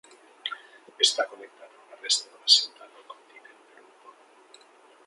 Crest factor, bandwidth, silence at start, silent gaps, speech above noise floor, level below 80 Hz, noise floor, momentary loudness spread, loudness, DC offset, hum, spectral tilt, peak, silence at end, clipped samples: 26 dB; 11.5 kHz; 0.45 s; none; 29 dB; under -90 dBFS; -56 dBFS; 22 LU; -24 LUFS; under 0.1%; none; 3.5 dB/octave; -4 dBFS; 1.95 s; under 0.1%